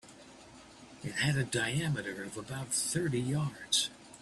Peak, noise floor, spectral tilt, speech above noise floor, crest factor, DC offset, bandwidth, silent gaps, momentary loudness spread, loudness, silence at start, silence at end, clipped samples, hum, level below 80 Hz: -16 dBFS; -54 dBFS; -3.5 dB/octave; 21 dB; 20 dB; under 0.1%; 13.5 kHz; none; 23 LU; -33 LUFS; 0.05 s; 0 s; under 0.1%; none; -64 dBFS